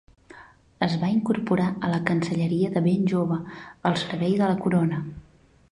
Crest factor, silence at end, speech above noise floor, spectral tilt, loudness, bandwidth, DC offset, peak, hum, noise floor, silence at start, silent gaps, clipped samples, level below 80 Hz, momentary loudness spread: 20 dB; 0.5 s; 26 dB; -7.5 dB/octave; -24 LUFS; 10.5 kHz; under 0.1%; -4 dBFS; none; -50 dBFS; 0.35 s; none; under 0.1%; -58 dBFS; 6 LU